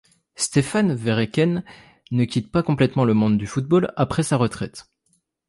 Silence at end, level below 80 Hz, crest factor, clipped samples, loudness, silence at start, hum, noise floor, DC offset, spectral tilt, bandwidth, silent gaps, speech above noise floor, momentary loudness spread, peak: 0.65 s; -50 dBFS; 16 dB; under 0.1%; -21 LUFS; 0.4 s; none; -68 dBFS; under 0.1%; -6 dB/octave; 11.5 kHz; none; 48 dB; 7 LU; -6 dBFS